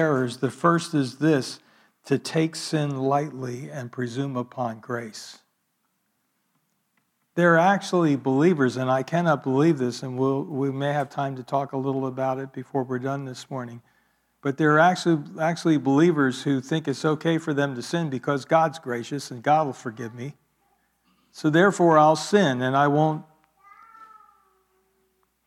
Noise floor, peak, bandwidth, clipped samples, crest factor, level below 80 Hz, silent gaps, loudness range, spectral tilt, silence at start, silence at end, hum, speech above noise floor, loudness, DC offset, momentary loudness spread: -73 dBFS; -6 dBFS; 13.5 kHz; under 0.1%; 18 dB; -76 dBFS; none; 8 LU; -6 dB/octave; 0 s; 1.45 s; none; 50 dB; -23 LUFS; under 0.1%; 14 LU